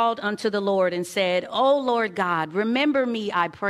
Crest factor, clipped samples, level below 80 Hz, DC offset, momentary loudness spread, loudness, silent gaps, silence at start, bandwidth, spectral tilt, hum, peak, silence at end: 16 dB; under 0.1%; -68 dBFS; under 0.1%; 4 LU; -23 LUFS; none; 0 s; 14 kHz; -5 dB/octave; none; -8 dBFS; 0 s